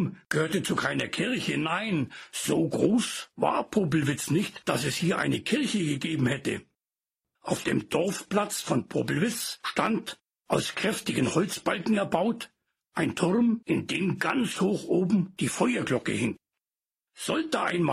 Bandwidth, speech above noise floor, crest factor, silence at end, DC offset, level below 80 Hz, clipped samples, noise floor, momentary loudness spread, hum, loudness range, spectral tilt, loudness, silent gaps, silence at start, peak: 15.5 kHz; over 63 dB; 18 dB; 0 s; under 0.1%; -64 dBFS; under 0.1%; under -90 dBFS; 6 LU; none; 2 LU; -5 dB/octave; -28 LUFS; none; 0 s; -10 dBFS